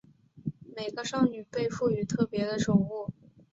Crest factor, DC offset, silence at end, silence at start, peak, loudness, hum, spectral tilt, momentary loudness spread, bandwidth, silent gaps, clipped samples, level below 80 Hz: 20 dB; under 0.1%; 0.4 s; 0.35 s; -10 dBFS; -30 LUFS; none; -6 dB/octave; 14 LU; 8 kHz; none; under 0.1%; -60 dBFS